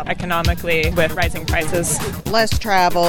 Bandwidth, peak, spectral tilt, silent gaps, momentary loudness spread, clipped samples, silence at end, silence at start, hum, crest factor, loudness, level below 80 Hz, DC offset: 17.5 kHz; -2 dBFS; -4 dB/octave; none; 5 LU; under 0.1%; 0 s; 0 s; none; 16 dB; -18 LUFS; -28 dBFS; under 0.1%